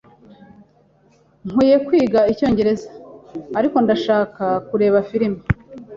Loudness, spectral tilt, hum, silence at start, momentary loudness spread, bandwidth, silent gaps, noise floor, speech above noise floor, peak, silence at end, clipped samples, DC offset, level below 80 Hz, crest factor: -18 LUFS; -8 dB/octave; none; 1.45 s; 11 LU; 7.6 kHz; none; -55 dBFS; 38 dB; -2 dBFS; 0 s; under 0.1%; under 0.1%; -42 dBFS; 18 dB